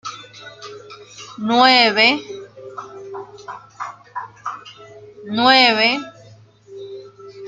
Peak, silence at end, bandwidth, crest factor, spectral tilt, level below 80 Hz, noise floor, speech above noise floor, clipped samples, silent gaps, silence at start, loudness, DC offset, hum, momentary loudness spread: 0 dBFS; 0 s; 9 kHz; 20 dB; -3 dB/octave; -68 dBFS; -46 dBFS; 32 dB; under 0.1%; none; 0.05 s; -14 LUFS; under 0.1%; none; 26 LU